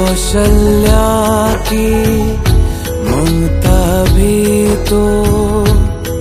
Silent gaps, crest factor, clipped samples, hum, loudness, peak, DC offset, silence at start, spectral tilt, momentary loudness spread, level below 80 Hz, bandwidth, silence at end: none; 10 dB; under 0.1%; none; -12 LUFS; 0 dBFS; under 0.1%; 0 s; -6 dB/octave; 4 LU; -14 dBFS; 15.5 kHz; 0 s